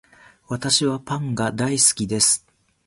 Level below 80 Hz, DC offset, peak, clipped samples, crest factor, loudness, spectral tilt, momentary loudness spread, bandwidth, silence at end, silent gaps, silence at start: -54 dBFS; under 0.1%; -2 dBFS; under 0.1%; 20 dB; -19 LUFS; -3 dB/octave; 10 LU; 12 kHz; 0.5 s; none; 0.5 s